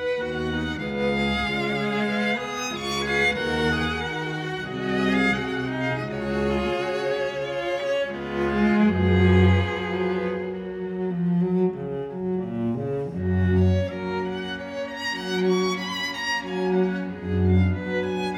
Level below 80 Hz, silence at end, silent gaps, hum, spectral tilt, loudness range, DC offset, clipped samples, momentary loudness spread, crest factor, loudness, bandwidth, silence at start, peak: -44 dBFS; 0 s; none; none; -6.5 dB/octave; 4 LU; under 0.1%; under 0.1%; 8 LU; 18 dB; -24 LUFS; 13.5 kHz; 0 s; -6 dBFS